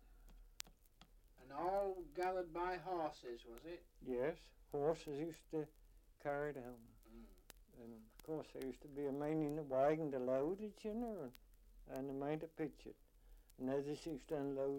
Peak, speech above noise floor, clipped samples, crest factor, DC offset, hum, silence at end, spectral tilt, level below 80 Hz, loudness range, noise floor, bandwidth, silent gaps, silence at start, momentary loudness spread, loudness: -20 dBFS; 24 dB; under 0.1%; 24 dB; under 0.1%; none; 0 s; -6.5 dB/octave; -66 dBFS; 7 LU; -68 dBFS; 16.5 kHz; none; 0 s; 18 LU; -45 LUFS